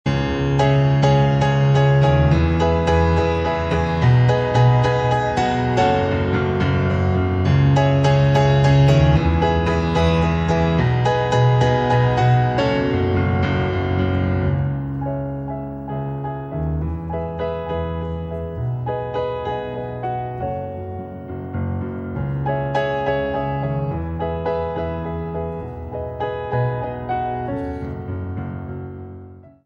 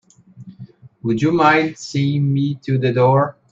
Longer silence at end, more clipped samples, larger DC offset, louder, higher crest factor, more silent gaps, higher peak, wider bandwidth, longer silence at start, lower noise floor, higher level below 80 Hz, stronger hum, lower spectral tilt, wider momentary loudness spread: about the same, 0.2 s vs 0.2 s; neither; neither; about the same, -19 LUFS vs -17 LUFS; about the same, 16 dB vs 16 dB; neither; about the same, -4 dBFS vs -2 dBFS; about the same, 7.6 kHz vs 7.6 kHz; second, 0.05 s vs 0.35 s; about the same, -40 dBFS vs -41 dBFS; first, -32 dBFS vs -58 dBFS; neither; about the same, -7.5 dB/octave vs -7 dB/octave; first, 13 LU vs 8 LU